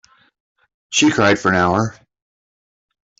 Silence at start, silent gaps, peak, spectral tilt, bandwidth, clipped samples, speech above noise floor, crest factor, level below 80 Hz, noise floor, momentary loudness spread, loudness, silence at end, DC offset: 0.9 s; none; -2 dBFS; -4 dB/octave; 8 kHz; under 0.1%; over 75 dB; 18 dB; -56 dBFS; under -90 dBFS; 7 LU; -16 LUFS; 1.3 s; under 0.1%